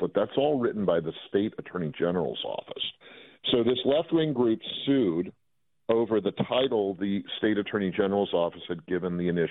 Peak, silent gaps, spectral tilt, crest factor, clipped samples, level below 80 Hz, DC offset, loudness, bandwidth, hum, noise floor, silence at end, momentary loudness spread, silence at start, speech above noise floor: -10 dBFS; none; -10 dB/octave; 18 dB; under 0.1%; -64 dBFS; under 0.1%; -28 LUFS; 4.1 kHz; none; -51 dBFS; 0 s; 9 LU; 0 s; 24 dB